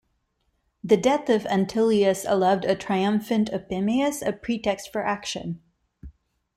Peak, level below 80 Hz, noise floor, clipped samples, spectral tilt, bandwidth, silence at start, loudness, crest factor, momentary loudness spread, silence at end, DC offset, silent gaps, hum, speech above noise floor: -6 dBFS; -56 dBFS; -72 dBFS; under 0.1%; -5.5 dB/octave; 15.5 kHz; 0.85 s; -24 LUFS; 18 dB; 9 LU; 0.45 s; under 0.1%; none; none; 49 dB